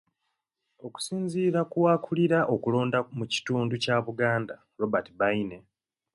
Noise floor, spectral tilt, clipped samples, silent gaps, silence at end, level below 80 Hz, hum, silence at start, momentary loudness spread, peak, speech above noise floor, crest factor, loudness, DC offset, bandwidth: -81 dBFS; -6 dB/octave; under 0.1%; none; 0.55 s; -66 dBFS; none; 0.85 s; 10 LU; -10 dBFS; 54 dB; 18 dB; -27 LUFS; under 0.1%; 11.5 kHz